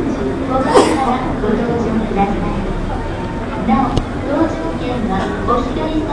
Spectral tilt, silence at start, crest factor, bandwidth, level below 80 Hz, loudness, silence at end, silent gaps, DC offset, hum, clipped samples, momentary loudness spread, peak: -6.5 dB/octave; 0 s; 16 dB; 10.5 kHz; -26 dBFS; -17 LUFS; 0 s; none; under 0.1%; none; under 0.1%; 9 LU; 0 dBFS